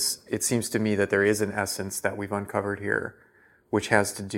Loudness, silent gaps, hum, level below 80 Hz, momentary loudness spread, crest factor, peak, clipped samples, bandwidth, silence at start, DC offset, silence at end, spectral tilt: -26 LUFS; none; none; -64 dBFS; 7 LU; 22 dB; -4 dBFS; under 0.1%; 16.5 kHz; 0 s; under 0.1%; 0 s; -4 dB/octave